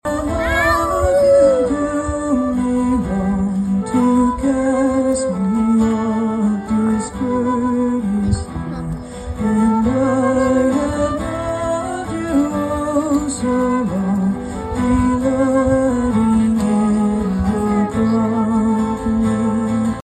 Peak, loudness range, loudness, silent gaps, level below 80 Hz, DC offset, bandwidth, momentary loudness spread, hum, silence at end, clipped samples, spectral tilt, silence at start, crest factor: -2 dBFS; 3 LU; -17 LUFS; none; -34 dBFS; under 0.1%; 13 kHz; 6 LU; none; 0.05 s; under 0.1%; -7 dB/octave; 0.05 s; 14 dB